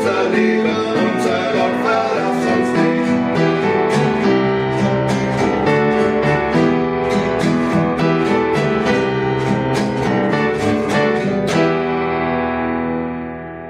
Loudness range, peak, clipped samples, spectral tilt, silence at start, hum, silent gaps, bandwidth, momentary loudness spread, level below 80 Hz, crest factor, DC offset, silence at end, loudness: 1 LU; -2 dBFS; under 0.1%; -6.5 dB/octave; 0 s; none; none; 14 kHz; 3 LU; -42 dBFS; 14 dB; under 0.1%; 0 s; -16 LUFS